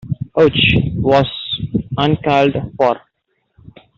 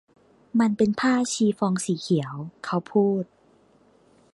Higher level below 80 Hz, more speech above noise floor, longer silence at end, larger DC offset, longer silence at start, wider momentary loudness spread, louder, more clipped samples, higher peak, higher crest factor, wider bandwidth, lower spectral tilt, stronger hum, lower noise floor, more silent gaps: first, -38 dBFS vs -66 dBFS; first, 53 dB vs 36 dB; about the same, 1 s vs 1.1 s; neither; second, 0.05 s vs 0.55 s; about the same, 9 LU vs 8 LU; first, -15 LUFS vs -24 LUFS; neither; first, -2 dBFS vs -8 dBFS; about the same, 14 dB vs 16 dB; second, 7.4 kHz vs 11.5 kHz; first, -7.5 dB/octave vs -5.5 dB/octave; neither; first, -67 dBFS vs -59 dBFS; neither